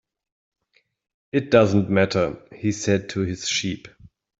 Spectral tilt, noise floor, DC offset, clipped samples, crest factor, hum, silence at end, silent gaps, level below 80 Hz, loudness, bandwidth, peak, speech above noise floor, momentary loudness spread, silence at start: -5 dB/octave; -67 dBFS; under 0.1%; under 0.1%; 20 dB; none; 0.5 s; none; -56 dBFS; -22 LUFS; 8 kHz; -2 dBFS; 46 dB; 10 LU; 1.35 s